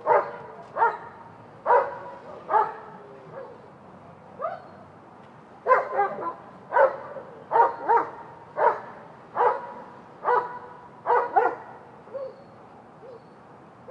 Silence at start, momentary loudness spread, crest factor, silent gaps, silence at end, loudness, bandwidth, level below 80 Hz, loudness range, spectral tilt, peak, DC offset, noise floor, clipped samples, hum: 0 s; 24 LU; 22 dB; none; 0.35 s; -25 LUFS; 7 kHz; -74 dBFS; 6 LU; -6.5 dB/octave; -6 dBFS; under 0.1%; -49 dBFS; under 0.1%; none